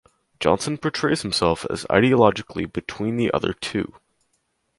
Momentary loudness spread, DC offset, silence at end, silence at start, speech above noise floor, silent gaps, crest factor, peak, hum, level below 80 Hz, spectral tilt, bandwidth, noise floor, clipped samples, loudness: 11 LU; under 0.1%; 0.9 s; 0.4 s; 49 dB; none; 22 dB; 0 dBFS; none; -48 dBFS; -5 dB/octave; 11.5 kHz; -71 dBFS; under 0.1%; -22 LUFS